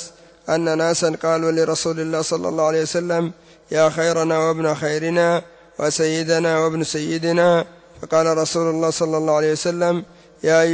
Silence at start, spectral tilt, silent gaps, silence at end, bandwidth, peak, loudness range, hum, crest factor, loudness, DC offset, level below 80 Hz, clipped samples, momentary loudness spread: 0 s; -4.5 dB/octave; none; 0 s; 8 kHz; -6 dBFS; 1 LU; none; 14 dB; -19 LUFS; under 0.1%; -60 dBFS; under 0.1%; 7 LU